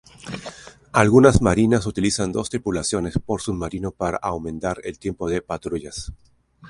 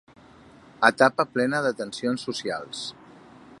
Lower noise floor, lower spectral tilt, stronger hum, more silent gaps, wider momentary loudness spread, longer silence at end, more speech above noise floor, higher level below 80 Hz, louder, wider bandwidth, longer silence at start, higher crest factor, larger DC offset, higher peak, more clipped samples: second, -40 dBFS vs -51 dBFS; first, -5.5 dB/octave vs -4 dB/octave; neither; neither; first, 19 LU vs 14 LU; about the same, 0 s vs 0.05 s; second, 19 dB vs 27 dB; first, -38 dBFS vs -68 dBFS; first, -21 LUFS vs -24 LUFS; about the same, 11.5 kHz vs 11.5 kHz; second, 0.25 s vs 0.8 s; about the same, 22 dB vs 26 dB; neither; about the same, 0 dBFS vs -2 dBFS; neither